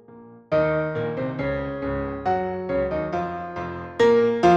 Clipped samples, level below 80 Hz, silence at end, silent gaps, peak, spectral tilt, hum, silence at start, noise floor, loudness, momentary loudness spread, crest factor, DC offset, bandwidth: under 0.1%; -44 dBFS; 0 s; none; -4 dBFS; -7 dB/octave; none; 0.1 s; -46 dBFS; -24 LUFS; 12 LU; 18 dB; under 0.1%; 8 kHz